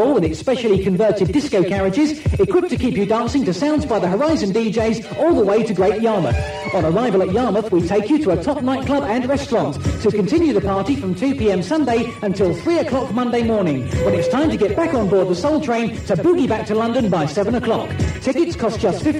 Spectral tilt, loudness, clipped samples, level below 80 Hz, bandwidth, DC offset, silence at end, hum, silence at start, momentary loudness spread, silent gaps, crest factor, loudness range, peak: -7 dB/octave; -18 LUFS; under 0.1%; -36 dBFS; 12.5 kHz; under 0.1%; 0 s; none; 0 s; 4 LU; none; 12 dB; 1 LU; -6 dBFS